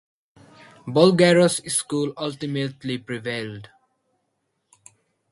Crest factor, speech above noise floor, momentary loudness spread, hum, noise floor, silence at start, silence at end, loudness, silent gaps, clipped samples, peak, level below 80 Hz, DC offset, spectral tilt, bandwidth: 22 dB; 53 dB; 15 LU; none; -74 dBFS; 0.85 s; 1.65 s; -21 LUFS; none; under 0.1%; -2 dBFS; -64 dBFS; under 0.1%; -4.5 dB/octave; 11.5 kHz